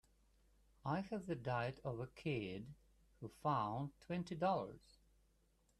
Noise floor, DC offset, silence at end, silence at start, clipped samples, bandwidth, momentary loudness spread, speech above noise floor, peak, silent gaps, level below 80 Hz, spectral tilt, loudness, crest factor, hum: -77 dBFS; under 0.1%; 1 s; 0.85 s; under 0.1%; 13 kHz; 13 LU; 34 dB; -26 dBFS; none; -70 dBFS; -7.5 dB/octave; -44 LUFS; 18 dB; none